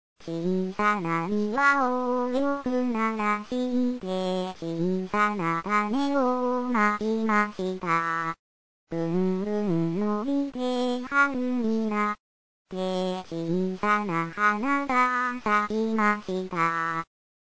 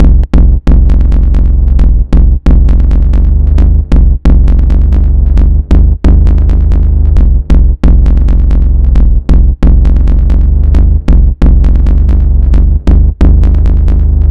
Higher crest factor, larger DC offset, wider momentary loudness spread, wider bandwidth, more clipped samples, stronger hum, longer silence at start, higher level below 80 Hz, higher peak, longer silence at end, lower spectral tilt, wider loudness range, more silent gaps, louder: first, 16 dB vs 4 dB; second, 0.6% vs 3%; first, 7 LU vs 2 LU; first, 8 kHz vs 3.5 kHz; neither; neither; first, 0.15 s vs 0 s; second, -62 dBFS vs -4 dBFS; second, -10 dBFS vs 0 dBFS; first, 0.45 s vs 0 s; second, -6.5 dB/octave vs -10 dB/octave; about the same, 2 LU vs 0 LU; first, 8.39-8.87 s, 12.20-12.65 s vs none; second, -26 LUFS vs -9 LUFS